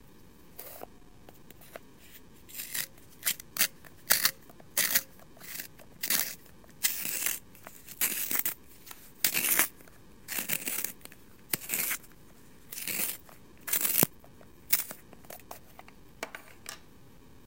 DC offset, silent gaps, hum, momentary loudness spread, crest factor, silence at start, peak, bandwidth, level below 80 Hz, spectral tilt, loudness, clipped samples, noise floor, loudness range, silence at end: 0.2%; none; none; 23 LU; 34 dB; 0.6 s; -2 dBFS; 17 kHz; -64 dBFS; -0.5 dB/octave; -29 LUFS; under 0.1%; -56 dBFS; 6 LU; 0.65 s